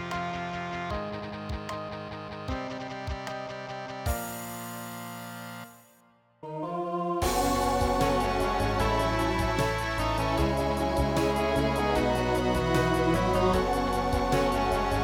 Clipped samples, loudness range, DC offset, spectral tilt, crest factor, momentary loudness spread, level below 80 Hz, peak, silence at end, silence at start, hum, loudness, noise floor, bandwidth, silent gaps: under 0.1%; 10 LU; under 0.1%; -5.5 dB/octave; 18 dB; 13 LU; -38 dBFS; -10 dBFS; 0 s; 0 s; none; -28 LUFS; -62 dBFS; over 20 kHz; none